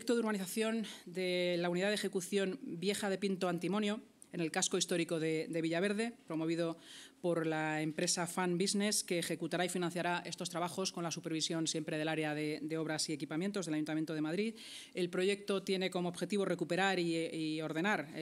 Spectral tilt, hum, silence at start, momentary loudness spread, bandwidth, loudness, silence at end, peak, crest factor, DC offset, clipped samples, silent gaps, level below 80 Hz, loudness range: -4 dB/octave; none; 0 s; 6 LU; 16 kHz; -36 LUFS; 0 s; -18 dBFS; 18 dB; under 0.1%; under 0.1%; none; -88 dBFS; 2 LU